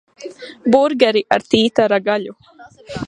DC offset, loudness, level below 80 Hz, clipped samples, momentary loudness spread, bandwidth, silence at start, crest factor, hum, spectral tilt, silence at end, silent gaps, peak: under 0.1%; -16 LUFS; -54 dBFS; under 0.1%; 19 LU; 10.5 kHz; 0.2 s; 16 dB; none; -5 dB/octave; 0 s; none; 0 dBFS